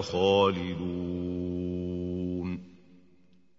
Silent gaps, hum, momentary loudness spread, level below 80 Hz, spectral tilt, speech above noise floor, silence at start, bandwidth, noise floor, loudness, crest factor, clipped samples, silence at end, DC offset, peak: none; none; 10 LU; -56 dBFS; -6.5 dB/octave; 36 dB; 0 s; 7.8 kHz; -64 dBFS; -30 LUFS; 18 dB; under 0.1%; 0.85 s; under 0.1%; -12 dBFS